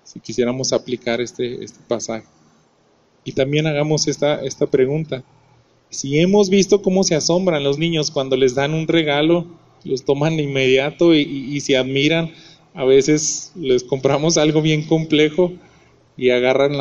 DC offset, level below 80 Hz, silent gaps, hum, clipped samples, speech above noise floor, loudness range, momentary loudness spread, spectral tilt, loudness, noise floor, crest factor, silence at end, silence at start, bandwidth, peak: under 0.1%; -52 dBFS; none; none; under 0.1%; 40 dB; 5 LU; 11 LU; -4.5 dB/octave; -18 LUFS; -57 dBFS; 16 dB; 0 s; 0.05 s; 10 kHz; -2 dBFS